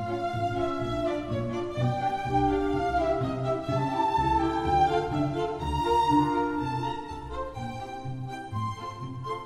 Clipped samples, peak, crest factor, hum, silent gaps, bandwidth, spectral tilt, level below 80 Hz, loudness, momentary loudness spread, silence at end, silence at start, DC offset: under 0.1%; -12 dBFS; 16 dB; none; none; 13.5 kHz; -7 dB/octave; -44 dBFS; -28 LUFS; 12 LU; 0 s; 0 s; under 0.1%